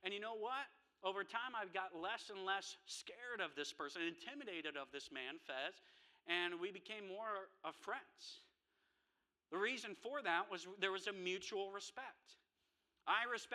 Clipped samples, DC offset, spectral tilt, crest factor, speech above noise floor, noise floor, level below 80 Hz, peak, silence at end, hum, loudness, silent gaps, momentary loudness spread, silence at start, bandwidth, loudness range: under 0.1%; under 0.1%; -2 dB/octave; 24 dB; 42 dB; -88 dBFS; under -90 dBFS; -24 dBFS; 0 s; none; -45 LUFS; none; 11 LU; 0 s; 13.5 kHz; 3 LU